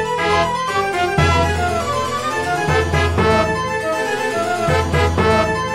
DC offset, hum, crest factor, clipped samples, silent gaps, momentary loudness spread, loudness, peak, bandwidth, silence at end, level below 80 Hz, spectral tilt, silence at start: 0.6%; none; 16 dB; under 0.1%; none; 5 LU; -17 LUFS; -2 dBFS; 15 kHz; 0 s; -32 dBFS; -5 dB/octave; 0 s